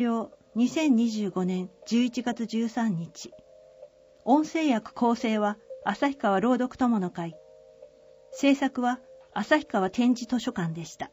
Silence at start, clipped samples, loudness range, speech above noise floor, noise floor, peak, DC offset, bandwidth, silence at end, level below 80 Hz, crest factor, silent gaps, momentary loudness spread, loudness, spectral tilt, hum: 0 s; under 0.1%; 3 LU; 26 dB; -52 dBFS; -8 dBFS; under 0.1%; 15.5 kHz; 0.05 s; -66 dBFS; 20 dB; none; 12 LU; -27 LUFS; -5.5 dB/octave; none